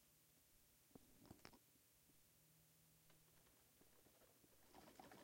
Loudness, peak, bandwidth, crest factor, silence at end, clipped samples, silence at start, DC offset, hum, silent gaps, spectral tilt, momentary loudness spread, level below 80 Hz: -67 LUFS; -40 dBFS; 16.5 kHz; 32 dB; 0 s; under 0.1%; 0 s; under 0.1%; none; none; -3.5 dB/octave; 4 LU; -86 dBFS